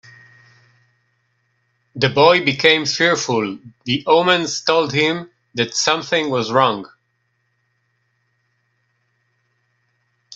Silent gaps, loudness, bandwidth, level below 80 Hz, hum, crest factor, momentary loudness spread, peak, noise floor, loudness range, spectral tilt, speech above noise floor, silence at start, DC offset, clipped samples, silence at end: none; -16 LUFS; 8 kHz; -62 dBFS; none; 20 dB; 13 LU; 0 dBFS; -68 dBFS; 7 LU; -3.5 dB/octave; 51 dB; 1.95 s; under 0.1%; under 0.1%; 0 s